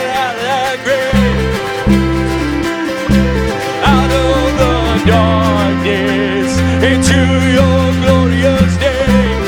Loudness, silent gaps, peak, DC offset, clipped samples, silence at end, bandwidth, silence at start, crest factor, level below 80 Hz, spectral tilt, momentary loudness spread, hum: -12 LUFS; none; 0 dBFS; under 0.1%; under 0.1%; 0 s; 18.5 kHz; 0 s; 12 dB; -22 dBFS; -6 dB/octave; 5 LU; none